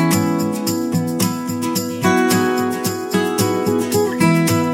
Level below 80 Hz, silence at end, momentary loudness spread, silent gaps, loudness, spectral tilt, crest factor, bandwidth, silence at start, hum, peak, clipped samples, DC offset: -56 dBFS; 0 s; 5 LU; none; -18 LUFS; -5 dB/octave; 16 dB; 17 kHz; 0 s; none; -2 dBFS; under 0.1%; under 0.1%